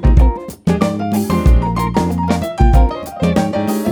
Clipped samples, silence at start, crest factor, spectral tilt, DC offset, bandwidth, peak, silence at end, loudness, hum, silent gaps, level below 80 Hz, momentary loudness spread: under 0.1%; 0 s; 12 dB; -7.5 dB/octave; under 0.1%; 20 kHz; 0 dBFS; 0 s; -16 LUFS; none; none; -16 dBFS; 6 LU